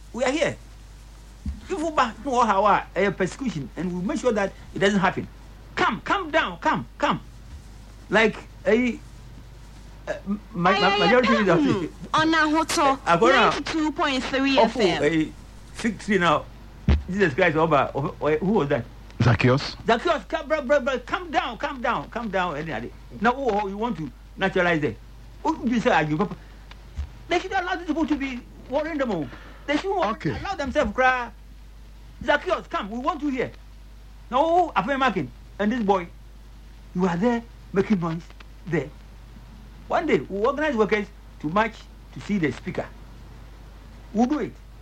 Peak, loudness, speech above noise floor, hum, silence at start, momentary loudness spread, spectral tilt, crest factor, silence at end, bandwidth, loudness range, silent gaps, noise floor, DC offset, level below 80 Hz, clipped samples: -8 dBFS; -23 LUFS; 21 dB; none; 0 s; 15 LU; -5.5 dB/octave; 16 dB; 0 s; 15 kHz; 6 LU; none; -44 dBFS; under 0.1%; -42 dBFS; under 0.1%